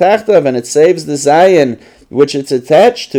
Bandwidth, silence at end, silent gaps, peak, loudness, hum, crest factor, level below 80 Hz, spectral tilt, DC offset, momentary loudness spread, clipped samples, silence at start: 16 kHz; 0 s; none; 0 dBFS; -10 LUFS; none; 10 dB; -54 dBFS; -4.5 dB/octave; under 0.1%; 9 LU; under 0.1%; 0 s